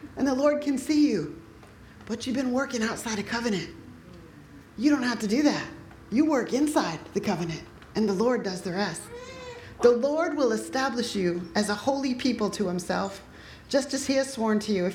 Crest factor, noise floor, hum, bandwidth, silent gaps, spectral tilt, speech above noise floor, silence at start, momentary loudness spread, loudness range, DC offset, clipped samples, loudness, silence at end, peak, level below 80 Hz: 20 dB; -49 dBFS; none; 16 kHz; none; -5 dB/octave; 23 dB; 0 s; 17 LU; 3 LU; under 0.1%; under 0.1%; -27 LUFS; 0 s; -8 dBFS; -56 dBFS